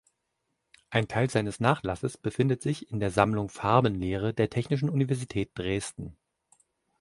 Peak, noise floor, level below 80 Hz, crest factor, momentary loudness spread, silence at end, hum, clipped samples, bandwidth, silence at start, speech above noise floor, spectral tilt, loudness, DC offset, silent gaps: -6 dBFS; -80 dBFS; -52 dBFS; 24 dB; 8 LU; 0.9 s; none; under 0.1%; 11.5 kHz; 0.9 s; 52 dB; -6.5 dB/octave; -28 LUFS; under 0.1%; none